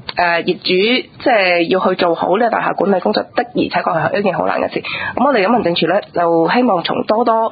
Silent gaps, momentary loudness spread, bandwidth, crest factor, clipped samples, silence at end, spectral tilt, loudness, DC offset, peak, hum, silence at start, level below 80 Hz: none; 5 LU; 5 kHz; 14 dB; under 0.1%; 0 s; -9.5 dB/octave; -15 LUFS; under 0.1%; 0 dBFS; none; 0.05 s; -52 dBFS